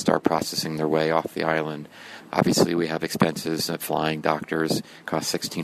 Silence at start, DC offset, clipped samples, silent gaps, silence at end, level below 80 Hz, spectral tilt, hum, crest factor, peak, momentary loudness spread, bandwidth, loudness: 0 s; under 0.1%; under 0.1%; none; 0 s; -60 dBFS; -4.5 dB/octave; none; 22 dB; -2 dBFS; 7 LU; 13.5 kHz; -24 LUFS